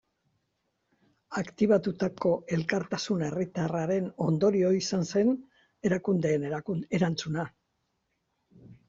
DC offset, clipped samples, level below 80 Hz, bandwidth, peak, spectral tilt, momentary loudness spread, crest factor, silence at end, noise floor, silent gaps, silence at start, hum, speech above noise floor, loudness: under 0.1%; under 0.1%; -66 dBFS; 7.6 kHz; -12 dBFS; -6.5 dB/octave; 9 LU; 18 dB; 0.15 s; -78 dBFS; none; 1.3 s; none; 50 dB; -29 LUFS